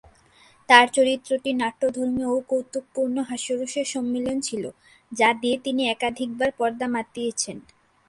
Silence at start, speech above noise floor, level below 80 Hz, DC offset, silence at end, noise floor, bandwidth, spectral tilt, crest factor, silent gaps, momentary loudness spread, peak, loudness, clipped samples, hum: 0.7 s; 32 dB; -62 dBFS; under 0.1%; 0.45 s; -56 dBFS; 11.5 kHz; -2.5 dB/octave; 24 dB; none; 11 LU; 0 dBFS; -23 LUFS; under 0.1%; none